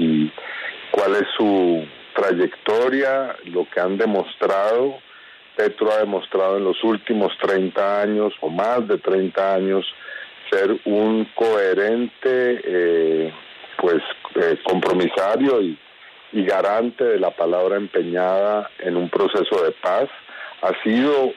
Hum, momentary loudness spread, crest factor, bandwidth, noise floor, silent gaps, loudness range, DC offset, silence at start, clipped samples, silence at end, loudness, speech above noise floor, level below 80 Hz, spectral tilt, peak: none; 7 LU; 14 dB; 10.5 kHz; -45 dBFS; none; 1 LU; under 0.1%; 0 s; under 0.1%; 0 s; -20 LUFS; 26 dB; -70 dBFS; -6.5 dB/octave; -6 dBFS